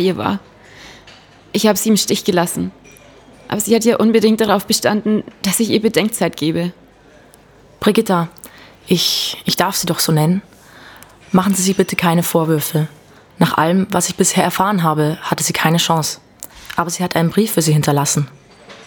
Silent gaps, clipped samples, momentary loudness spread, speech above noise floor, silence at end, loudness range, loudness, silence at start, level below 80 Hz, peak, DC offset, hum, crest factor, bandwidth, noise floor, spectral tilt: none; under 0.1%; 8 LU; 30 dB; 0.05 s; 3 LU; -16 LUFS; 0 s; -52 dBFS; 0 dBFS; under 0.1%; none; 16 dB; over 20 kHz; -46 dBFS; -4.5 dB/octave